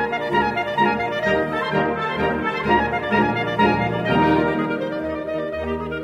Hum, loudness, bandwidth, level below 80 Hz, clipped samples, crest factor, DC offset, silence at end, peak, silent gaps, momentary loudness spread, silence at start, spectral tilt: none; -21 LUFS; 14 kHz; -42 dBFS; under 0.1%; 16 dB; under 0.1%; 0 s; -6 dBFS; none; 7 LU; 0 s; -7 dB/octave